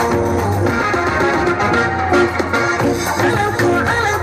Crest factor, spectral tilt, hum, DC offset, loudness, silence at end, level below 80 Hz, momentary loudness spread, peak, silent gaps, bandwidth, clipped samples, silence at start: 12 dB; -5.5 dB/octave; none; under 0.1%; -16 LUFS; 0 s; -36 dBFS; 2 LU; -4 dBFS; none; 15 kHz; under 0.1%; 0 s